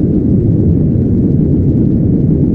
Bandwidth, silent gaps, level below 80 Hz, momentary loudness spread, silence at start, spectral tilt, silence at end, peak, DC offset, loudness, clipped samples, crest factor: 2.3 kHz; none; -22 dBFS; 1 LU; 0 s; -14 dB/octave; 0 s; 0 dBFS; under 0.1%; -11 LUFS; under 0.1%; 10 dB